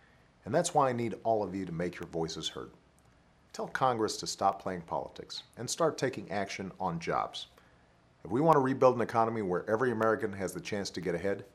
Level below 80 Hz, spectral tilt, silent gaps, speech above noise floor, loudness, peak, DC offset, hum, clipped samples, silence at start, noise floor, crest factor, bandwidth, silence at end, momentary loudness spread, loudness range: -66 dBFS; -5 dB/octave; none; 32 dB; -32 LUFS; -8 dBFS; under 0.1%; none; under 0.1%; 0.45 s; -64 dBFS; 24 dB; 14 kHz; 0.1 s; 15 LU; 6 LU